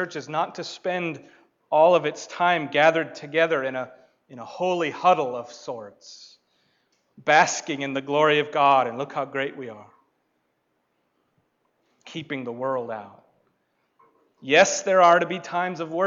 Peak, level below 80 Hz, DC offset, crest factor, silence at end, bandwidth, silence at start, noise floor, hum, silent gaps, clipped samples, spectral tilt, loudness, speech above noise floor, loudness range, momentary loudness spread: -6 dBFS; -76 dBFS; under 0.1%; 20 dB; 0 s; 7.8 kHz; 0 s; -73 dBFS; none; none; under 0.1%; -3.5 dB/octave; -22 LUFS; 50 dB; 12 LU; 20 LU